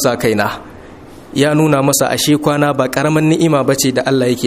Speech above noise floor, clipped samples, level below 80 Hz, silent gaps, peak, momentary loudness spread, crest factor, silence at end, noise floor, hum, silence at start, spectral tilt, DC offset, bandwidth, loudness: 22 dB; under 0.1%; -46 dBFS; none; 0 dBFS; 5 LU; 14 dB; 0 s; -35 dBFS; none; 0 s; -4.5 dB/octave; under 0.1%; 15.5 kHz; -13 LUFS